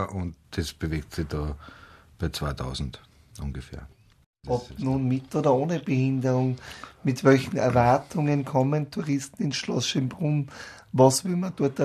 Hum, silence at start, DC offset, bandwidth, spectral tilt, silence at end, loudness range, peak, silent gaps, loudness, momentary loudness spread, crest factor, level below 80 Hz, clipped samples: none; 0 s; under 0.1%; 13.5 kHz; -6 dB/octave; 0 s; 10 LU; -6 dBFS; 4.26-4.33 s; -26 LUFS; 16 LU; 20 dB; -46 dBFS; under 0.1%